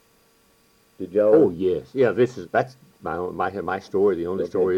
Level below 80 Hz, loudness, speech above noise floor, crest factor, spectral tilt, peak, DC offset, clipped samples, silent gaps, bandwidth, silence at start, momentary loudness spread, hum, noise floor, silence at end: -58 dBFS; -22 LUFS; 38 dB; 16 dB; -7.5 dB/octave; -6 dBFS; under 0.1%; under 0.1%; none; 10 kHz; 1 s; 13 LU; none; -60 dBFS; 0 s